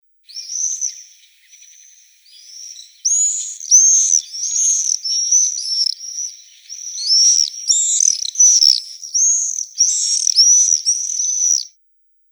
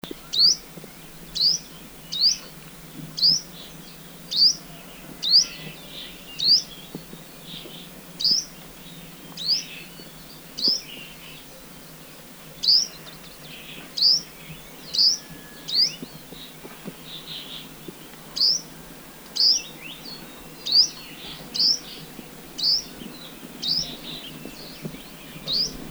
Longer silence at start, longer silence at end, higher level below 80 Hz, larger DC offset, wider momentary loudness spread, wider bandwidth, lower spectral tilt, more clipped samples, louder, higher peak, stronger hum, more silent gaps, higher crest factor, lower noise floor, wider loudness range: first, 0.3 s vs 0.05 s; first, 0.65 s vs 0 s; second, under -90 dBFS vs -56 dBFS; neither; second, 18 LU vs 23 LU; about the same, over 20 kHz vs over 20 kHz; second, 15 dB/octave vs -0.5 dB/octave; neither; first, -13 LUFS vs -20 LUFS; first, 0 dBFS vs -6 dBFS; neither; neither; about the same, 18 dB vs 20 dB; first, -58 dBFS vs -43 dBFS; about the same, 5 LU vs 7 LU